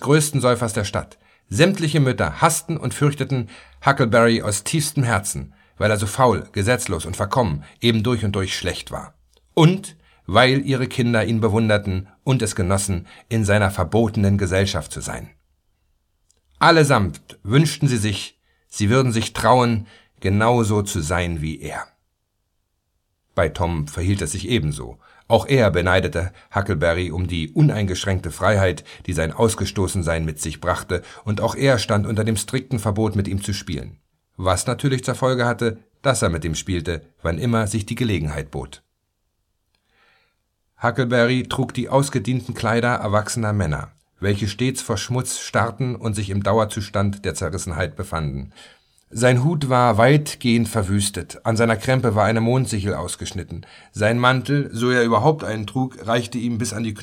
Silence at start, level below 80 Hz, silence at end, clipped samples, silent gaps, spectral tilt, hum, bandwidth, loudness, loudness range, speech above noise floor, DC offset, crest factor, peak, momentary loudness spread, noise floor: 0 s; -42 dBFS; 0 s; under 0.1%; none; -5.5 dB/octave; none; 17.5 kHz; -20 LUFS; 5 LU; 52 dB; under 0.1%; 20 dB; 0 dBFS; 11 LU; -72 dBFS